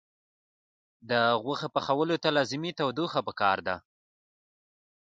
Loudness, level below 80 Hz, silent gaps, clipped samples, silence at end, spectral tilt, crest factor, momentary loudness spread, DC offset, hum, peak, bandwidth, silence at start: -28 LUFS; -68 dBFS; none; under 0.1%; 1.35 s; -5 dB/octave; 20 dB; 5 LU; under 0.1%; none; -10 dBFS; 9 kHz; 1.05 s